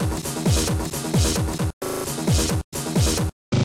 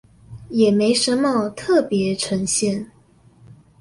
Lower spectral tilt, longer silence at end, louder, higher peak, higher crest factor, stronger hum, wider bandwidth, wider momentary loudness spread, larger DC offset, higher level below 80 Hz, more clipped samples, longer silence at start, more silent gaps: about the same, -4.5 dB/octave vs -4 dB/octave; second, 0 s vs 0.95 s; second, -23 LUFS vs -19 LUFS; second, -10 dBFS vs -4 dBFS; about the same, 12 dB vs 16 dB; neither; first, 16.5 kHz vs 11.5 kHz; about the same, 6 LU vs 8 LU; neither; first, -30 dBFS vs -54 dBFS; neither; second, 0 s vs 0.3 s; first, 1.73-1.81 s, 2.64-2.72 s, 3.32-3.52 s vs none